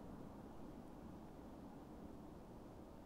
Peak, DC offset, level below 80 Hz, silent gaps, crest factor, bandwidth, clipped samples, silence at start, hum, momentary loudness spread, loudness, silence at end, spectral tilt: -42 dBFS; under 0.1%; -66 dBFS; none; 14 dB; 16 kHz; under 0.1%; 0 s; none; 2 LU; -57 LUFS; 0 s; -7.5 dB/octave